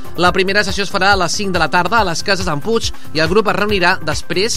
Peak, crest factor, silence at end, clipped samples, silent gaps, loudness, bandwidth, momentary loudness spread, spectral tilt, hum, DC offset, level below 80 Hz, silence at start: 0 dBFS; 14 dB; 0 s; under 0.1%; none; -15 LUFS; 16 kHz; 5 LU; -3.5 dB/octave; none; 9%; -34 dBFS; 0 s